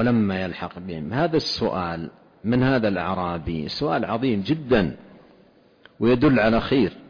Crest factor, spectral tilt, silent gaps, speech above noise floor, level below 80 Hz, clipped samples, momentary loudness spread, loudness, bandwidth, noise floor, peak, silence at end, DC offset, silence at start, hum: 14 dB; -7.5 dB/octave; none; 33 dB; -46 dBFS; under 0.1%; 13 LU; -23 LUFS; 5.4 kHz; -55 dBFS; -8 dBFS; 0.05 s; under 0.1%; 0 s; none